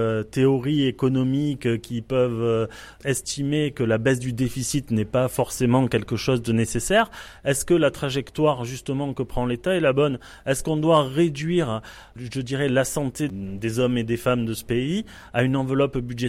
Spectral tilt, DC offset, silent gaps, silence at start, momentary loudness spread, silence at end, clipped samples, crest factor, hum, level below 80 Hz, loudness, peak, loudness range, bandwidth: -5.5 dB/octave; under 0.1%; none; 0 s; 8 LU; 0 s; under 0.1%; 16 dB; none; -46 dBFS; -23 LUFS; -6 dBFS; 2 LU; 16 kHz